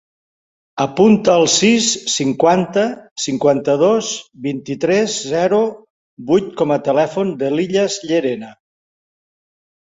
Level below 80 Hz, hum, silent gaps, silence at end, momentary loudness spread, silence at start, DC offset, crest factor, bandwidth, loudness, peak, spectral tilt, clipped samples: -58 dBFS; none; 3.11-3.16 s, 5.90-6.17 s; 1.35 s; 11 LU; 0.75 s; under 0.1%; 16 dB; 8 kHz; -16 LUFS; -2 dBFS; -4 dB/octave; under 0.1%